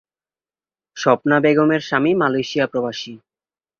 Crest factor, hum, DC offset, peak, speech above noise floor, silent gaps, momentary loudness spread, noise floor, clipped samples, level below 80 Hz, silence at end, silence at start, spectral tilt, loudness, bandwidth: 18 dB; none; under 0.1%; -2 dBFS; over 72 dB; none; 10 LU; under -90 dBFS; under 0.1%; -62 dBFS; 0.65 s; 0.95 s; -6 dB/octave; -18 LUFS; 7 kHz